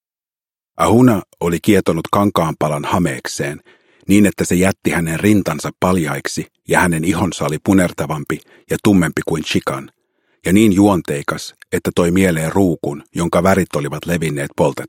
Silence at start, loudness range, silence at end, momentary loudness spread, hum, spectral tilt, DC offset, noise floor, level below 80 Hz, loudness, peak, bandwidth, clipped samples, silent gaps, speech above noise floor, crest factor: 0.8 s; 2 LU; 0 s; 11 LU; none; -5.5 dB/octave; under 0.1%; under -90 dBFS; -44 dBFS; -16 LUFS; 0 dBFS; 16.5 kHz; under 0.1%; none; over 74 dB; 16 dB